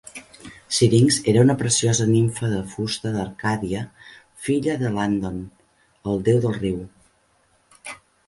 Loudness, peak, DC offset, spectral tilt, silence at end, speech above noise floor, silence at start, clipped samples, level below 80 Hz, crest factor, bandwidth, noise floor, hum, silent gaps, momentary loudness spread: -21 LUFS; -4 dBFS; under 0.1%; -5 dB/octave; 0.35 s; 42 dB; 0.15 s; under 0.1%; -50 dBFS; 18 dB; 11.5 kHz; -62 dBFS; none; none; 21 LU